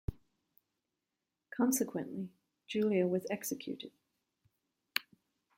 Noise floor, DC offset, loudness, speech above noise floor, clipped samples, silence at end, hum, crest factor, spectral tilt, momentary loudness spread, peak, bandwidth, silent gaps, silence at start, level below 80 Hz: -89 dBFS; under 0.1%; -36 LUFS; 54 dB; under 0.1%; 0.55 s; none; 26 dB; -4.5 dB/octave; 15 LU; -12 dBFS; 16.5 kHz; none; 0.1 s; -58 dBFS